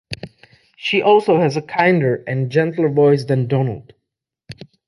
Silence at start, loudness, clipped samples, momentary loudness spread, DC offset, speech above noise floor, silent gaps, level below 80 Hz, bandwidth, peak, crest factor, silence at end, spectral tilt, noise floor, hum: 0.1 s; -17 LUFS; under 0.1%; 15 LU; under 0.1%; 64 dB; none; -56 dBFS; 11.5 kHz; -2 dBFS; 16 dB; 0.25 s; -7.5 dB/octave; -80 dBFS; none